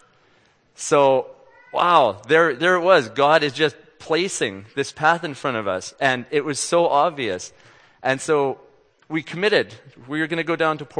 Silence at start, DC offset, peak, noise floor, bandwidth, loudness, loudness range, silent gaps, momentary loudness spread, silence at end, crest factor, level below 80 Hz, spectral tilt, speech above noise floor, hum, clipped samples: 0.8 s; under 0.1%; 0 dBFS; -59 dBFS; 9.8 kHz; -20 LUFS; 5 LU; none; 12 LU; 0 s; 20 dB; -68 dBFS; -3.5 dB/octave; 39 dB; none; under 0.1%